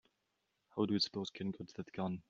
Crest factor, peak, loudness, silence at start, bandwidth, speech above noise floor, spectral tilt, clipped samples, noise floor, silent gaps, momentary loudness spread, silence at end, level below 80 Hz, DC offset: 18 dB; -22 dBFS; -39 LUFS; 0.75 s; 7.4 kHz; 45 dB; -5 dB/octave; under 0.1%; -84 dBFS; none; 13 LU; 0.1 s; -76 dBFS; under 0.1%